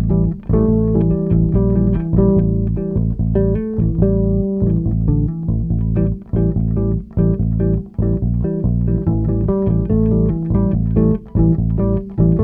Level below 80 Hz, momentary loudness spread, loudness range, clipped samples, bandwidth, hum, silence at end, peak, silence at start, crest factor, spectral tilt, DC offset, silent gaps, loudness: -24 dBFS; 4 LU; 2 LU; under 0.1%; 2.6 kHz; none; 0 s; -2 dBFS; 0 s; 14 dB; -14.5 dB/octave; under 0.1%; none; -17 LUFS